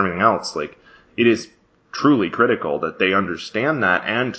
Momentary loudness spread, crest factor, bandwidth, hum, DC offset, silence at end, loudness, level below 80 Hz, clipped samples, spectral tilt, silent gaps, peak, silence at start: 13 LU; 18 dB; 8 kHz; none; under 0.1%; 0 s; -19 LUFS; -54 dBFS; under 0.1%; -5.5 dB/octave; none; 0 dBFS; 0 s